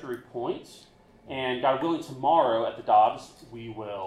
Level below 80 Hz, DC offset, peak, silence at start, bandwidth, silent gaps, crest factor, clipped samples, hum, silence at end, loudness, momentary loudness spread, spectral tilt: -64 dBFS; under 0.1%; -8 dBFS; 0 s; 13 kHz; none; 18 dB; under 0.1%; none; 0 s; -26 LUFS; 18 LU; -5.5 dB/octave